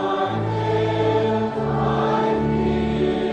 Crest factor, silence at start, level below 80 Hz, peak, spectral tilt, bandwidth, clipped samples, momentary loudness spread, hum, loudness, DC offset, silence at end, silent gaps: 12 dB; 0 s; -40 dBFS; -8 dBFS; -8 dB/octave; 8.8 kHz; under 0.1%; 3 LU; none; -21 LUFS; under 0.1%; 0 s; none